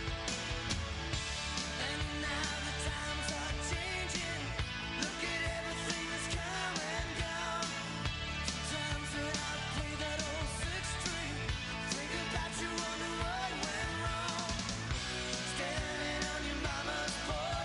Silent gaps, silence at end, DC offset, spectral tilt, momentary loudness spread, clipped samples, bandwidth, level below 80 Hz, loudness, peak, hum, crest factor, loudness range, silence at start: none; 0 s; under 0.1%; -3 dB/octave; 2 LU; under 0.1%; 11.5 kHz; -46 dBFS; -37 LUFS; -20 dBFS; none; 18 dB; 1 LU; 0 s